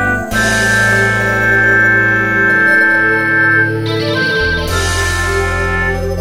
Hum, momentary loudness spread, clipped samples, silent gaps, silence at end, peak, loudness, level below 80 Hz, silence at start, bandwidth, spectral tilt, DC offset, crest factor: none; 6 LU; under 0.1%; none; 0 s; 0 dBFS; -11 LUFS; -28 dBFS; 0 s; 16 kHz; -4 dB/octave; under 0.1%; 12 dB